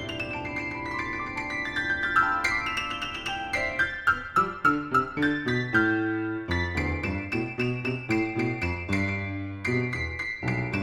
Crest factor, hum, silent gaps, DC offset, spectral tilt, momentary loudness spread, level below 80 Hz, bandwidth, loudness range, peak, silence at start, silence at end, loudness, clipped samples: 18 dB; none; none; under 0.1%; -5.5 dB/octave; 8 LU; -46 dBFS; 14.5 kHz; 3 LU; -8 dBFS; 0 s; 0 s; -27 LUFS; under 0.1%